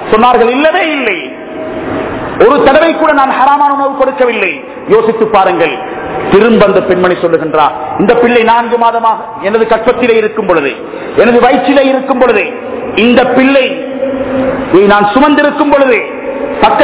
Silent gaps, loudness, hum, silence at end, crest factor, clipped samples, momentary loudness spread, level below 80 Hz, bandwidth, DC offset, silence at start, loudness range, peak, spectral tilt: none; -8 LUFS; none; 0 s; 8 dB; 4%; 10 LU; -40 dBFS; 4 kHz; under 0.1%; 0 s; 1 LU; 0 dBFS; -9.5 dB/octave